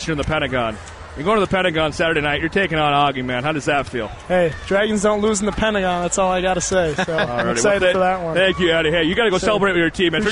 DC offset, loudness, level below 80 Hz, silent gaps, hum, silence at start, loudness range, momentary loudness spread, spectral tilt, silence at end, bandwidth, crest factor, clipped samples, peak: 0.2%; -18 LUFS; -38 dBFS; none; none; 0 s; 2 LU; 5 LU; -4 dB/octave; 0 s; 11 kHz; 12 dB; under 0.1%; -6 dBFS